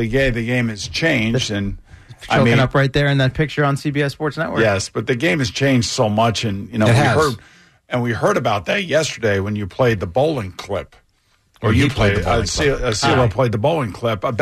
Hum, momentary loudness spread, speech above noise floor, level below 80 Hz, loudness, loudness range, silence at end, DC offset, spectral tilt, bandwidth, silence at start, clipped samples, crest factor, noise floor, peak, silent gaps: none; 8 LU; 43 dB; -36 dBFS; -18 LUFS; 2 LU; 0 s; under 0.1%; -5.5 dB/octave; 13.5 kHz; 0 s; under 0.1%; 12 dB; -60 dBFS; -6 dBFS; none